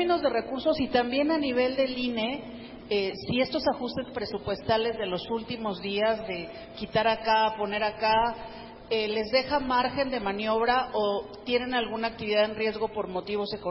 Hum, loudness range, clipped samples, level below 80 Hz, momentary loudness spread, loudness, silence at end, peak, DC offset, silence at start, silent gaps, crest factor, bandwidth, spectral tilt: none; 3 LU; under 0.1%; -54 dBFS; 8 LU; -28 LUFS; 0 s; -12 dBFS; under 0.1%; 0 s; none; 16 dB; 5.8 kHz; -8.5 dB/octave